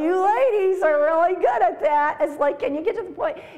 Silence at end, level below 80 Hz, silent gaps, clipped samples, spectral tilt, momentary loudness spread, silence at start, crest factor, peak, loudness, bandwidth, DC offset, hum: 0 s; -60 dBFS; none; under 0.1%; -5 dB/octave; 8 LU; 0 s; 12 dB; -8 dBFS; -21 LUFS; 12.5 kHz; 0.4%; none